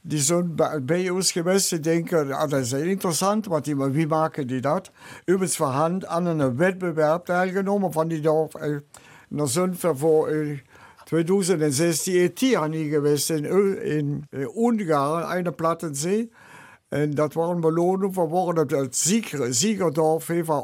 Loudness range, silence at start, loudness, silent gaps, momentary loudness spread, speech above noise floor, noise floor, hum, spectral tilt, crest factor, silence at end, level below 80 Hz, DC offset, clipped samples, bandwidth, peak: 2 LU; 0.05 s; -23 LUFS; none; 6 LU; 25 dB; -48 dBFS; none; -5 dB/octave; 14 dB; 0 s; -68 dBFS; under 0.1%; under 0.1%; 16.5 kHz; -8 dBFS